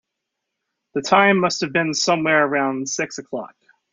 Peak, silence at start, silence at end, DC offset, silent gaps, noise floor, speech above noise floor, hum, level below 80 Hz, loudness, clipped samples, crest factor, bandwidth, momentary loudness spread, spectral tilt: -2 dBFS; 0.95 s; 0.45 s; under 0.1%; none; -80 dBFS; 61 dB; none; -66 dBFS; -19 LUFS; under 0.1%; 20 dB; 7.8 kHz; 15 LU; -3.5 dB/octave